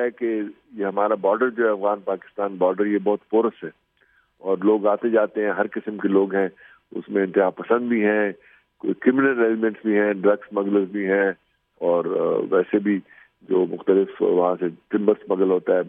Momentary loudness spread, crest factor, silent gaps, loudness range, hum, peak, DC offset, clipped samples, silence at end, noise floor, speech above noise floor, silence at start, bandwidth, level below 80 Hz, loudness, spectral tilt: 8 LU; 18 dB; none; 2 LU; none; -4 dBFS; under 0.1%; under 0.1%; 0 s; -62 dBFS; 41 dB; 0 s; 3.7 kHz; -74 dBFS; -22 LUFS; -10.5 dB/octave